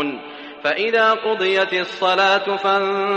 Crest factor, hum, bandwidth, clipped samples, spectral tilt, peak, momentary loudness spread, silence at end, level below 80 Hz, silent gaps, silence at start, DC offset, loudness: 16 dB; none; 8.6 kHz; under 0.1%; -4 dB/octave; -4 dBFS; 9 LU; 0 s; -70 dBFS; none; 0 s; under 0.1%; -18 LUFS